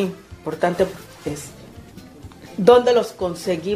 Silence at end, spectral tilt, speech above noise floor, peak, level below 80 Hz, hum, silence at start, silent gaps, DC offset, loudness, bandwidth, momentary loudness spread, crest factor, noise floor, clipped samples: 0 s; -5.5 dB/octave; 22 dB; 0 dBFS; -50 dBFS; none; 0 s; none; under 0.1%; -19 LUFS; 15 kHz; 20 LU; 20 dB; -41 dBFS; under 0.1%